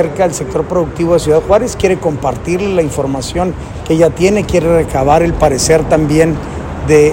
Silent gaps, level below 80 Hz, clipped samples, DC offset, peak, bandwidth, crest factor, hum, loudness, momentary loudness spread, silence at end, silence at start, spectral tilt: none; -28 dBFS; 0.3%; under 0.1%; 0 dBFS; 17 kHz; 12 dB; none; -12 LUFS; 7 LU; 0 s; 0 s; -5.5 dB/octave